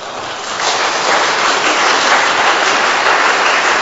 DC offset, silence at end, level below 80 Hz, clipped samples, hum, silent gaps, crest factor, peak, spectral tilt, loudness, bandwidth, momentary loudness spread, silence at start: under 0.1%; 0 s; -54 dBFS; under 0.1%; none; none; 12 dB; 0 dBFS; 0 dB/octave; -11 LUFS; 8.2 kHz; 6 LU; 0 s